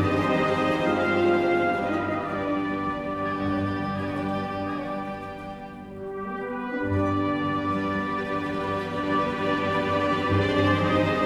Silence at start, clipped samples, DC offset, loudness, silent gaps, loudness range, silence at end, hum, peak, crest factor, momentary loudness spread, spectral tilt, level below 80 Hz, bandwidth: 0 s; under 0.1%; under 0.1%; -26 LUFS; none; 6 LU; 0 s; none; -10 dBFS; 14 dB; 10 LU; -7 dB/octave; -52 dBFS; 12.5 kHz